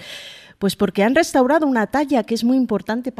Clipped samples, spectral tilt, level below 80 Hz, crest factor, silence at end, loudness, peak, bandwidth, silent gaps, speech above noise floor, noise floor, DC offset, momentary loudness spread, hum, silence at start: under 0.1%; -5 dB/octave; -52 dBFS; 16 dB; 0.1 s; -18 LUFS; -2 dBFS; 15 kHz; none; 20 dB; -38 dBFS; under 0.1%; 11 LU; none; 0 s